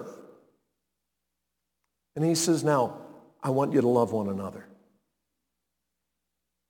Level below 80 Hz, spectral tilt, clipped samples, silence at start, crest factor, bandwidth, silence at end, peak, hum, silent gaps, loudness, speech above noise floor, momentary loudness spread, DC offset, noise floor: -78 dBFS; -5.5 dB/octave; under 0.1%; 0 s; 20 dB; 19 kHz; 2.1 s; -10 dBFS; none; none; -26 LUFS; 58 dB; 20 LU; under 0.1%; -84 dBFS